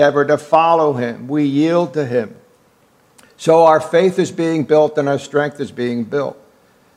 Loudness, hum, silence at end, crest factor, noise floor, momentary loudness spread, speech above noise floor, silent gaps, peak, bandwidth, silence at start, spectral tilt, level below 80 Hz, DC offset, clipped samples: -16 LUFS; none; 0.65 s; 16 dB; -54 dBFS; 10 LU; 39 dB; none; 0 dBFS; 12.5 kHz; 0 s; -6.5 dB/octave; -68 dBFS; under 0.1%; under 0.1%